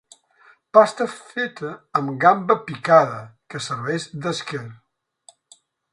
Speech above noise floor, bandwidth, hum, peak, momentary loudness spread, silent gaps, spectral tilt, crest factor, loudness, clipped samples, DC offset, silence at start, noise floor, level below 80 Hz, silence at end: 35 dB; 11 kHz; none; 0 dBFS; 17 LU; none; -5 dB/octave; 22 dB; -20 LUFS; under 0.1%; under 0.1%; 0.75 s; -55 dBFS; -68 dBFS; 1.2 s